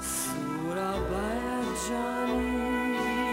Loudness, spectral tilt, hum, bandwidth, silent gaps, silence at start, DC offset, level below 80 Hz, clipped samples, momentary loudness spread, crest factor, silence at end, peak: -30 LUFS; -4 dB/octave; none; 16 kHz; none; 0 s; under 0.1%; -44 dBFS; under 0.1%; 3 LU; 14 dB; 0 s; -16 dBFS